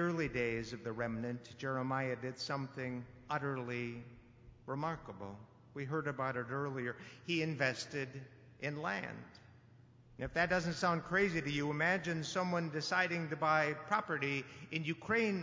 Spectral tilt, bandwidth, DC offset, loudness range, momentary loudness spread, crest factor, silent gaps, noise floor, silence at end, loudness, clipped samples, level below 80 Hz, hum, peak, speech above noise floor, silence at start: -5.5 dB/octave; 7.8 kHz; under 0.1%; 7 LU; 14 LU; 20 dB; none; -62 dBFS; 0 s; -37 LUFS; under 0.1%; -64 dBFS; none; -18 dBFS; 24 dB; 0 s